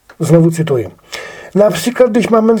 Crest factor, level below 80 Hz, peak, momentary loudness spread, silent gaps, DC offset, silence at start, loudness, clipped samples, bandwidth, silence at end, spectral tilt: 12 dB; -50 dBFS; 0 dBFS; 16 LU; none; under 0.1%; 0.2 s; -12 LUFS; under 0.1%; 19 kHz; 0 s; -6.5 dB/octave